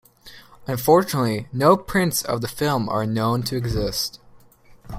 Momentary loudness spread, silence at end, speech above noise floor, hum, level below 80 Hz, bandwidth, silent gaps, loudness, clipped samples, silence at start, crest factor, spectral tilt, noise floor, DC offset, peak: 9 LU; 0 s; 29 dB; none; -44 dBFS; 16 kHz; none; -21 LUFS; under 0.1%; 0.25 s; 20 dB; -5 dB/octave; -50 dBFS; under 0.1%; -2 dBFS